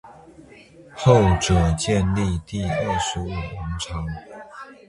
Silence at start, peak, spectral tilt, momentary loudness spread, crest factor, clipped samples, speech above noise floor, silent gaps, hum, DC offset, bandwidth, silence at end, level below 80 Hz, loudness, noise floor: 0.05 s; 0 dBFS; -5.5 dB/octave; 20 LU; 22 dB; under 0.1%; 26 dB; none; none; under 0.1%; 11.5 kHz; 0.15 s; -34 dBFS; -22 LUFS; -47 dBFS